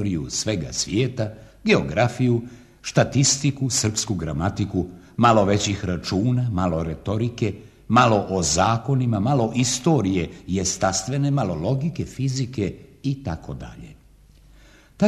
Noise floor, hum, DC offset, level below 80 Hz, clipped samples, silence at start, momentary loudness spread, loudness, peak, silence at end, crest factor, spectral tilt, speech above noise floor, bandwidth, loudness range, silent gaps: -51 dBFS; none; under 0.1%; -44 dBFS; under 0.1%; 0 s; 11 LU; -22 LUFS; -2 dBFS; 0 s; 20 dB; -5 dB/octave; 29 dB; 13.5 kHz; 5 LU; none